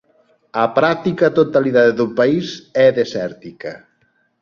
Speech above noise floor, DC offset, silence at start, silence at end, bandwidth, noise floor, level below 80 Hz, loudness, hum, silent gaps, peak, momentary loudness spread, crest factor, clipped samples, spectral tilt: 46 dB; under 0.1%; 0.55 s; 0.65 s; 7.2 kHz; -62 dBFS; -58 dBFS; -16 LUFS; none; none; -2 dBFS; 16 LU; 16 dB; under 0.1%; -6.5 dB/octave